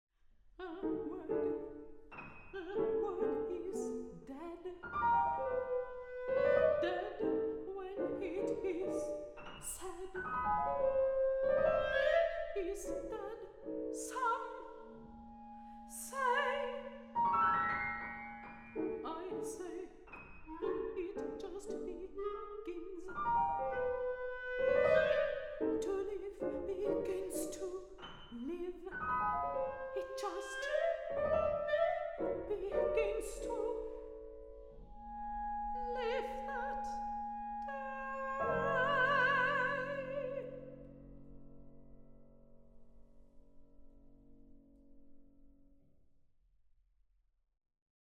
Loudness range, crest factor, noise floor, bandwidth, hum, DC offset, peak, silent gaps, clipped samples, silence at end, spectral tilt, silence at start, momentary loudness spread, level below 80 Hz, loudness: 8 LU; 20 dB; -74 dBFS; 16 kHz; none; under 0.1%; -18 dBFS; none; under 0.1%; 2.3 s; -4.5 dB/octave; 0.45 s; 18 LU; -60 dBFS; -37 LUFS